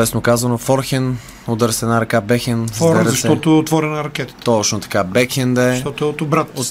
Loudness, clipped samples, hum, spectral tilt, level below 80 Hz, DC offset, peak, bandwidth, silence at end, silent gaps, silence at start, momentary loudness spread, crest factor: -16 LUFS; under 0.1%; none; -5 dB/octave; -44 dBFS; under 0.1%; 0 dBFS; 16 kHz; 0 s; none; 0 s; 7 LU; 16 dB